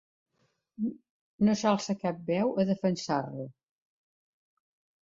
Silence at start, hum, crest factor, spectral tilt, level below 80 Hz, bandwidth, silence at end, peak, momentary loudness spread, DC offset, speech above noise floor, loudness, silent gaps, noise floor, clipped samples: 0.8 s; none; 20 dB; -6 dB/octave; -70 dBFS; 7.8 kHz; 1.5 s; -12 dBFS; 10 LU; under 0.1%; 47 dB; -30 LUFS; 1.10-1.39 s; -75 dBFS; under 0.1%